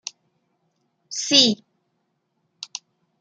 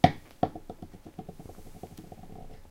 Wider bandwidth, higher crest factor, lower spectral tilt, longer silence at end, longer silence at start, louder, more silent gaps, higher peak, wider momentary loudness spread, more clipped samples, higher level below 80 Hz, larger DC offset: second, 12 kHz vs 16.5 kHz; about the same, 26 dB vs 30 dB; second, -1.5 dB/octave vs -7 dB/octave; first, 0.55 s vs 0 s; first, 1.1 s vs 0.05 s; first, -17 LUFS vs -35 LUFS; neither; about the same, 0 dBFS vs -2 dBFS; first, 22 LU vs 15 LU; neither; second, -76 dBFS vs -50 dBFS; neither